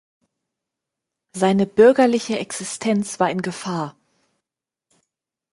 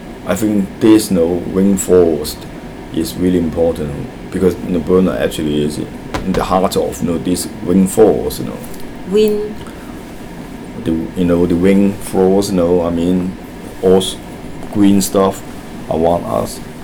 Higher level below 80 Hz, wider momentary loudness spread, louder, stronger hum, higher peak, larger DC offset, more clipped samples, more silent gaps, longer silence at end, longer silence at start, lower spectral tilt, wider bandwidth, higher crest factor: second, -66 dBFS vs -36 dBFS; second, 14 LU vs 18 LU; second, -19 LUFS vs -15 LUFS; neither; about the same, -2 dBFS vs 0 dBFS; neither; neither; neither; first, 1.65 s vs 0 s; first, 1.35 s vs 0 s; about the same, -5 dB/octave vs -6 dB/octave; second, 11.5 kHz vs over 20 kHz; first, 20 dB vs 14 dB